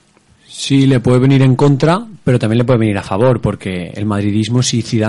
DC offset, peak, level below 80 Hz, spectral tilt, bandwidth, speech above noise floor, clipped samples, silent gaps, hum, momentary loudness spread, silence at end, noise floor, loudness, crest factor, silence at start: under 0.1%; -2 dBFS; -42 dBFS; -6.5 dB/octave; 11.5 kHz; 37 dB; under 0.1%; none; none; 9 LU; 0 s; -49 dBFS; -13 LUFS; 12 dB; 0.5 s